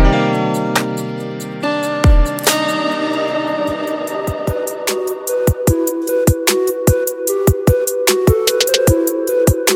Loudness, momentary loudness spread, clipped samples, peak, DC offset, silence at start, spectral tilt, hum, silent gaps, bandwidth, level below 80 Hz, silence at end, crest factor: -16 LUFS; 7 LU; under 0.1%; 0 dBFS; under 0.1%; 0 s; -4.5 dB/octave; none; none; 17 kHz; -22 dBFS; 0 s; 16 dB